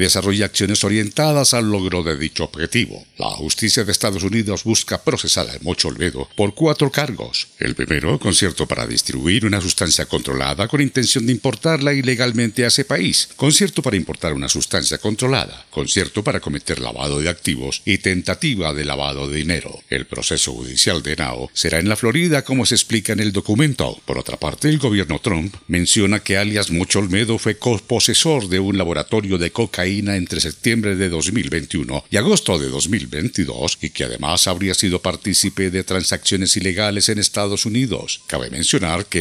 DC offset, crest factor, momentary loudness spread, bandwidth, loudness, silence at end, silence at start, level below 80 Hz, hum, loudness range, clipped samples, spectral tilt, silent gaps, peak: under 0.1%; 18 dB; 8 LU; 15.5 kHz; -18 LUFS; 0 s; 0 s; -42 dBFS; none; 3 LU; under 0.1%; -3.5 dB/octave; none; 0 dBFS